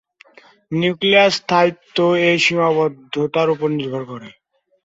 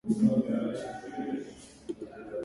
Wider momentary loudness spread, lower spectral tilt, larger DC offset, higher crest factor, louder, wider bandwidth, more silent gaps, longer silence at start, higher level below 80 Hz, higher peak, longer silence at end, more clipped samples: second, 12 LU vs 17 LU; second, -5 dB/octave vs -7.5 dB/octave; neither; about the same, 16 dB vs 18 dB; first, -17 LUFS vs -32 LUFS; second, 8 kHz vs 11.5 kHz; neither; first, 0.7 s vs 0.05 s; about the same, -62 dBFS vs -62 dBFS; first, -2 dBFS vs -14 dBFS; first, 0.55 s vs 0 s; neither